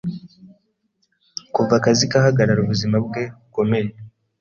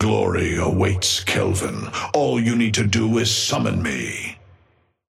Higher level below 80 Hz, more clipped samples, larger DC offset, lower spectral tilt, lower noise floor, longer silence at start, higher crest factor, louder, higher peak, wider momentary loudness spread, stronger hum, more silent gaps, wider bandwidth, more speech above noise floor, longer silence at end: second, -52 dBFS vs -44 dBFS; neither; neither; about the same, -5.5 dB/octave vs -4.5 dB/octave; first, -68 dBFS vs -61 dBFS; about the same, 0.05 s vs 0 s; about the same, 18 dB vs 16 dB; about the same, -19 LUFS vs -20 LUFS; about the same, -4 dBFS vs -4 dBFS; first, 15 LU vs 8 LU; neither; neither; second, 7.4 kHz vs 15.5 kHz; first, 50 dB vs 40 dB; second, 0.35 s vs 0.75 s